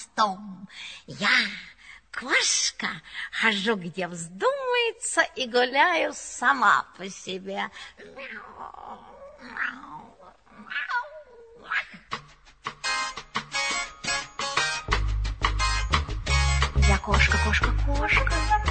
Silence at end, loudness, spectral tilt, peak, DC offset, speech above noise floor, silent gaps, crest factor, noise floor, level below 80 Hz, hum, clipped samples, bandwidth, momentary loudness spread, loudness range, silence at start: 0 s; -25 LUFS; -3 dB/octave; -6 dBFS; under 0.1%; 26 dB; none; 20 dB; -52 dBFS; -32 dBFS; none; under 0.1%; 9.2 kHz; 18 LU; 11 LU; 0 s